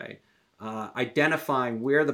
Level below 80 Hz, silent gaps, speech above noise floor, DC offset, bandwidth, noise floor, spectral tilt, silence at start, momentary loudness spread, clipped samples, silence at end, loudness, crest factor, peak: -80 dBFS; none; 28 dB; under 0.1%; 17 kHz; -54 dBFS; -6 dB/octave; 0 s; 16 LU; under 0.1%; 0 s; -27 LUFS; 16 dB; -10 dBFS